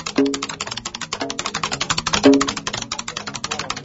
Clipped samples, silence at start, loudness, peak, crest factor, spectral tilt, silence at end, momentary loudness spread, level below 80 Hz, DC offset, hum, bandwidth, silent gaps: under 0.1%; 0 s; -21 LUFS; 0 dBFS; 20 dB; -3 dB/octave; 0 s; 12 LU; -48 dBFS; under 0.1%; none; 8 kHz; none